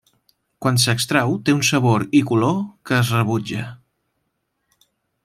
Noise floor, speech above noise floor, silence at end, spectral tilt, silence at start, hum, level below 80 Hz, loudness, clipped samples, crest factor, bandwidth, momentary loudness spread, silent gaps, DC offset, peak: -73 dBFS; 55 dB; 1.5 s; -5 dB/octave; 0.6 s; none; -58 dBFS; -19 LUFS; under 0.1%; 18 dB; 15.5 kHz; 9 LU; none; under 0.1%; -4 dBFS